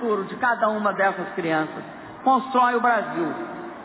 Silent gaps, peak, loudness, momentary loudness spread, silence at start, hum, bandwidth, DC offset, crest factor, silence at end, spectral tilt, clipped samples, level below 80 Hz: none; -8 dBFS; -23 LUFS; 13 LU; 0 s; none; 4 kHz; under 0.1%; 16 dB; 0 s; -9 dB/octave; under 0.1%; -66 dBFS